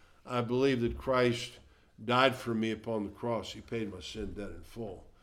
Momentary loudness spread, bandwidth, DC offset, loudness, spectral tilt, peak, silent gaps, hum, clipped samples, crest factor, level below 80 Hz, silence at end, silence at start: 16 LU; 15.5 kHz; under 0.1%; -32 LUFS; -5.5 dB/octave; -8 dBFS; none; none; under 0.1%; 24 dB; -52 dBFS; 0.15 s; 0.25 s